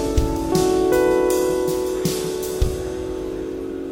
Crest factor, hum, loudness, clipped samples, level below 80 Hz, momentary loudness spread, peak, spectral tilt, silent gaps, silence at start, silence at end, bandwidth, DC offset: 16 dB; none; -21 LUFS; under 0.1%; -30 dBFS; 10 LU; -4 dBFS; -5.5 dB/octave; none; 0 s; 0 s; 17 kHz; under 0.1%